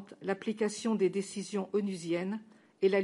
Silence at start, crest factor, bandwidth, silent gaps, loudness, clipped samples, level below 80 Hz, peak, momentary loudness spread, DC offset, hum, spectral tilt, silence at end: 0 s; 16 dB; 11.5 kHz; none; -34 LUFS; under 0.1%; -84 dBFS; -16 dBFS; 7 LU; under 0.1%; none; -5.5 dB/octave; 0 s